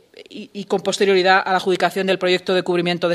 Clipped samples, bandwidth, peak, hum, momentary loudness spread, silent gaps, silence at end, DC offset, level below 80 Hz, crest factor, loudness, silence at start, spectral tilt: under 0.1%; 13.5 kHz; 0 dBFS; none; 18 LU; none; 0 s; under 0.1%; -68 dBFS; 18 dB; -18 LUFS; 0.2 s; -4.5 dB/octave